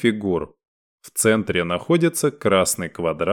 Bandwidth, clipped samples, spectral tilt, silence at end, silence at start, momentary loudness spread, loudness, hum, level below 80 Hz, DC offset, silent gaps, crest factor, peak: 19 kHz; under 0.1%; -4.5 dB/octave; 0 s; 0 s; 8 LU; -21 LUFS; none; -52 dBFS; under 0.1%; 0.68-0.98 s; 16 dB; -4 dBFS